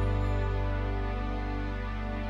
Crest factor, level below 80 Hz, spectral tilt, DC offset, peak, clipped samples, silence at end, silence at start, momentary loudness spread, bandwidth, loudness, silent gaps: 12 dB; -32 dBFS; -8 dB/octave; under 0.1%; -18 dBFS; under 0.1%; 0 s; 0 s; 5 LU; 7 kHz; -33 LUFS; none